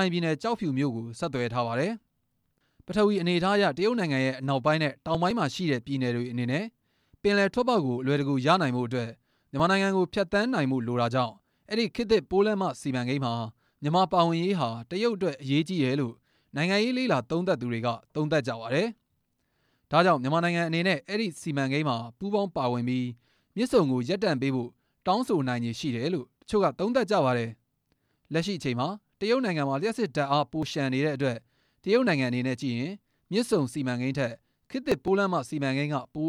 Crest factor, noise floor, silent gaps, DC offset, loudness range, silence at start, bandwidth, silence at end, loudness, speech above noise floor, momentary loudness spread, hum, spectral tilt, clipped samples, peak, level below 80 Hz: 20 dB; -75 dBFS; none; under 0.1%; 3 LU; 0 s; 14 kHz; 0 s; -27 LUFS; 49 dB; 8 LU; none; -6 dB/octave; under 0.1%; -8 dBFS; -62 dBFS